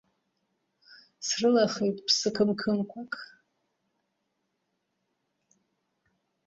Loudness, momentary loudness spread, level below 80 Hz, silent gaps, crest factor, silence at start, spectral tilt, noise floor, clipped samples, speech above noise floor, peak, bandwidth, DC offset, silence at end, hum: -27 LUFS; 15 LU; -72 dBFS; none; 22 dB; 0.9 s; -3.5 dB/octave; -79 dBFS; under 0.1%; 52 dB; -10 dBFS; 8 kHz; under 0.1%; 3.2 s; none